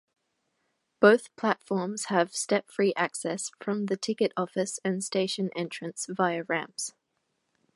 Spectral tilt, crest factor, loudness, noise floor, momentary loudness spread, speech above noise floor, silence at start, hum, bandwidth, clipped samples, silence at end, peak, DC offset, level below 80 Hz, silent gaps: -4 dB/octave; 24 dB; -28 LUFS; -78 dBFS; 11 LU; 50 dB; 1 s; none; 11.5 kHz; under 0.1%; 0.85 s; -6 dBFS; under 0.1%; -80 dBFS; none